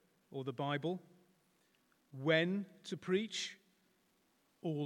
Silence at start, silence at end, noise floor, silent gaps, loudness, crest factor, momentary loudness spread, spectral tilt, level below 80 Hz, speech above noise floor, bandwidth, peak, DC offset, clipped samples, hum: 0.3 s; 0 s; -76 dBFS; none; -39 LUFS; 22 dB; 14 LU; -5 dB/octave; under -90 dBFS; 38 dB; 13.5 kHz; -18 dBFS; under 0.1%; under 0.1%; none